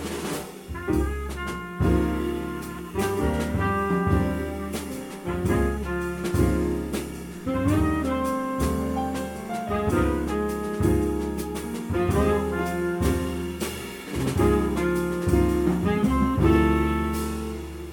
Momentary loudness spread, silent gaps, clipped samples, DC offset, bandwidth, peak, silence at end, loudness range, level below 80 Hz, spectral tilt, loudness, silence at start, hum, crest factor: 10 LU; none; under 0.1%; under 0.1%; 19 kHz; -8 dBFS; 0 s; 4 LU; -34 dBFS; -6.5 dB/octave; -26 LUFS; 0 s; none; 16 dB